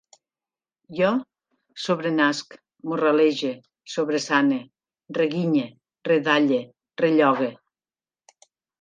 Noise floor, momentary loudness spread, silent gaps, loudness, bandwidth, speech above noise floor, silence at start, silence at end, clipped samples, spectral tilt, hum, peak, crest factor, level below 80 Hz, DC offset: under -90 dBFS; 15 LU; none; -23 LUFS; 9.4 kHz; over 68 dB; 0.9 s; 1.3 s; under 0.1%; -5.5 dB/octave; none; -4 dBFS; 20 dB; -74 dBFS; under 0.1%